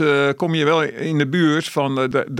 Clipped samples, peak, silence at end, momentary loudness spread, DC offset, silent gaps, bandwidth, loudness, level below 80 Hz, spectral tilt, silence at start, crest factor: under 0.1%; -4 dBFS; 0 s; 4 LU; under 0.1%; none; 16 kHz; -19 LUFS; -62 dBFS; -6 dB/octave; 0 s; 14 dB